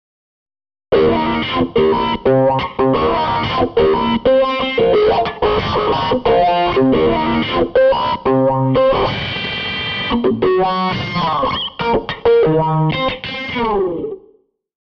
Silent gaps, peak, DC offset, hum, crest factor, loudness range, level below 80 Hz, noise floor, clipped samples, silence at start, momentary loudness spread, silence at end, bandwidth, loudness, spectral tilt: none; -2 dBFS; under 0.1%; none; 12 dB; 2 LU; -36 dBFS; -53 dBFS; under 0.1%; 0.9 s; 6 LU; 0.65 s; 6.4 kHz; -15 LUFS; -8 dB/octave